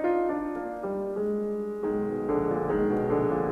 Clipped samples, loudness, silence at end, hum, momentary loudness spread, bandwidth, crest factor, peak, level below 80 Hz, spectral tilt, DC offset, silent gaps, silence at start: under 0.1%; -29 LUFS; 0 s; none; 6 LU; 5 kHz; 14 dB; -14 dBFS; -52 dBFS; -9.5 dB/octave; under 0.1%; none; 0 s